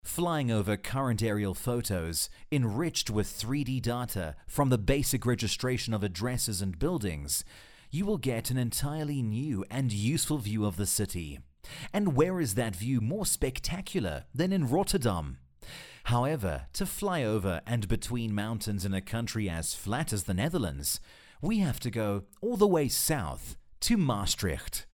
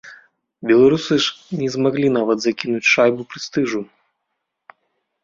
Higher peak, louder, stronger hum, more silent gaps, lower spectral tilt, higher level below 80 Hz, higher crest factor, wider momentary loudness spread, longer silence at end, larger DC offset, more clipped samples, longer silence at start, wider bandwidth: second, -10 dBFS vs -2 dBFS; second, -31 LUFS vs -18 LUFS; neither; neither; about the same, -5 dB/octave vs -5 dB/octave; first, -46 dBFS vs -60 dBFS; about the same, 20 dB vs 18 dB; second, 8 LU vs 12 LU; second, 0.1 s vs 1.4 s; neither; neither; about the same, 0.05 s vs 0.05 s; first, 19 kHz vs 7.6 kHz